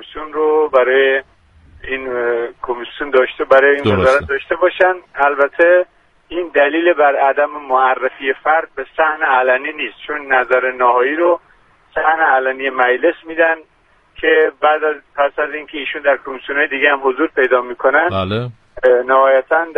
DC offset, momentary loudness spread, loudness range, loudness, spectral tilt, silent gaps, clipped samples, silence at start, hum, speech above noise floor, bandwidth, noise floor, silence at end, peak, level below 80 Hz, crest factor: under 0.1%; 11 LU; 3 LU; -15 LUFS; -6.5 dB/octave; none; under 0.1%; 0 s; none; 35 dB; 6.8 kHz; -49 dBFS; 0.05 s; 0 dBFS; -50 dBFS; 16 dB